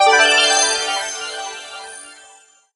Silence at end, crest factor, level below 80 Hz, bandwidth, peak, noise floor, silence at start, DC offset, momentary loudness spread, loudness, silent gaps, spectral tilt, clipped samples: 0.6 s; 18 dB; -62 dBFS; 11.5 kHz; 0 dBFS; -49 dBFS; 0 s; under 0.1%; 22 LU; -14 LUFS; none; 2.5 dB/octave; under 0.1%